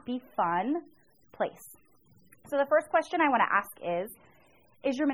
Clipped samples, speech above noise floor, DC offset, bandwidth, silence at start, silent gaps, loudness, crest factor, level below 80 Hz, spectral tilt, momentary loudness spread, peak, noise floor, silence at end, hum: under 0.1%; 34 dB; under 0.1%; 18.5 kHz; 0.05 s; none; -29 LUFS; 20 dB; -72 dBFS; -5 dB/octave; 10 LU; -12 dBFS; -63 dBFS; 0 s; none